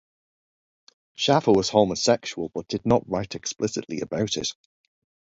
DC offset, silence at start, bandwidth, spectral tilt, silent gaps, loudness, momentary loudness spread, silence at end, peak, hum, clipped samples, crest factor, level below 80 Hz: under 0.1%; 1.2 s; 8 kHz; -4.5 dB/octave; none; -24 LUFS; 11 LU; 0.8 s; -4 dBFS; none; under 0.1%; 22 dB; -56 dBFS